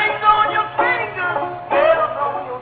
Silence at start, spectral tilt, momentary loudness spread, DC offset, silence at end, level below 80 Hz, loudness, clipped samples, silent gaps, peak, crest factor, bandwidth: 0 s; -7.5 dB/octave; 8 LU; under 0.1%; 0 s; -50 dBFS; -17 LUFS; under 0.1%; none; -2 dBFS; 16 dB; 4.7 kHz